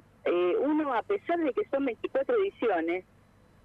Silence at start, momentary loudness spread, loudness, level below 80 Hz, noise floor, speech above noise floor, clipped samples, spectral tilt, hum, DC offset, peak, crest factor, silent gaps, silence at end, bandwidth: 0.25 s; 4 LU; -29 LUFS; -68 dBFS; -60 dBFS; 31 dB; under 0.1%; -7 dB/octave; 50 Hz at -65 dBFS; under 0.1%; -18 dBFS; 12 dB; none; 0.65 s; 4.8 kHz